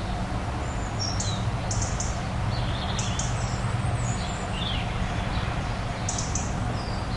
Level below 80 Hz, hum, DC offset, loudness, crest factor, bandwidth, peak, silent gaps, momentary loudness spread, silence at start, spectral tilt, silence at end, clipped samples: -34 dBFS; none; under 0.1%; -28 LUFS; 12 dB; 11.5 kHz; -14 dBFS; none; 3 LU; 0 s; -4.5 dB/octave; 0 s; under 0.1%